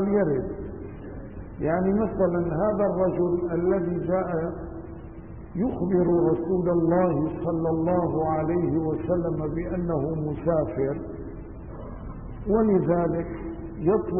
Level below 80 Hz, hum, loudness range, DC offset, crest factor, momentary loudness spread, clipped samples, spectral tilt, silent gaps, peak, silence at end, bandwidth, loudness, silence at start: -42 dBFS; none; 4 LU; 0.3%; 16 dB; 17 LU; under 0.1%; -14 dB/octave; none; -10 dBFS; 0 s; 3.1 kHz; -25 LUFS; 0 s